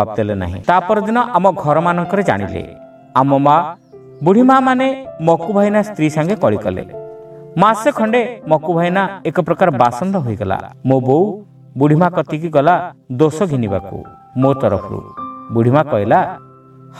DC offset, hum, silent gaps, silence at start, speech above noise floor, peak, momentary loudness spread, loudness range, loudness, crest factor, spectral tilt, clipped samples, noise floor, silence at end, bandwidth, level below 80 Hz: under 0.1%; none; none; 0 s; 26 dB; 0 dBFS; 14 LU; 3 LU; -15 LUFS; 16 dB; -7.5 dB/octave; under 0.1%; -41 dBFS; 0 s; 13 kHz; -50 dBFS